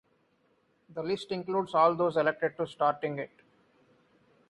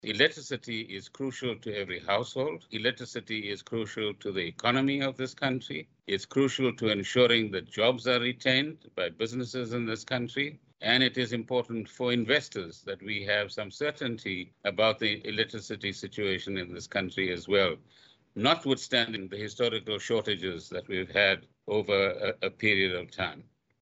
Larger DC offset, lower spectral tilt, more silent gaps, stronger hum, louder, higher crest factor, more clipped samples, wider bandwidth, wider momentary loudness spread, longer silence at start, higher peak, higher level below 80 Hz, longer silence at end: neither; first, -6.5 dB/octave vs -4.5 dB/octave; neither; neither; about the same, -29 LUFS vs -30 LUFS; about the same, 20 dB vs 22 dB; neither; first, 11.5 kHz vs 8.2 kHz; first, 14 LU vs 10 LU; first, 0.9 s vs 0.05 s; second, -12 dBFS vs -8 dBFS; second, -74 dBFS vs -68 dBFS; first, 1.25 s vs 0.4 s